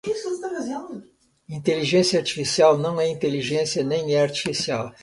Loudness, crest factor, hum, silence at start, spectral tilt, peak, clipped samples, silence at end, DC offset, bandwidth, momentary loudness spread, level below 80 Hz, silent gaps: -22 LUFS; 18 dB; none; 0.05 s; -4.5 dB/octave; -4 dBFS; under 0.1%; 0.1 s; under 0.1%; 11.5 kHz; 13 LU; -62 dBFS; none